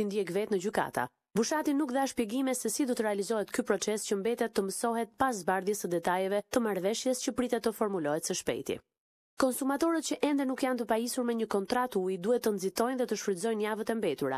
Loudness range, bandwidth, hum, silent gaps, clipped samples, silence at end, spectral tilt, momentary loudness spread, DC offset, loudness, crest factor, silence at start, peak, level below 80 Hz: 1 LU; 15 kHz; none; 8.98-9.37 s; under 0.1%; 0 s; -4 dB/octave; 3 LU; under 0.1%; -31 LUFS; 18 dB; 0 s; -14 dBFS; -68 dBFS